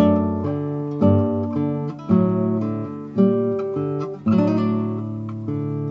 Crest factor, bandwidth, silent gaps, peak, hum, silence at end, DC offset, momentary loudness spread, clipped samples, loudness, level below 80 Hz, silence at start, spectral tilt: 16 dB; 5.8 kHz; none; -4 dBFS; none; 0 s; under 0.1%; 9 LU; under 0.1%; -22 LUFS; -56 dBFS; 0 s; -10.5 dB/octave